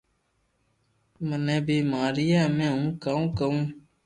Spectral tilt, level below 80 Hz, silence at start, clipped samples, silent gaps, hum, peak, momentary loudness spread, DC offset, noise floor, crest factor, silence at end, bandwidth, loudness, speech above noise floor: -7 dB/octave; -54 dBFS; 1.2 s; under 0.1%; none; none; -12 dBFS; 8 LU; under 0.1%; -71 dBFS; 14 dB; 0.25 s; 9.8 kHz; -26 LUFS; 47 dB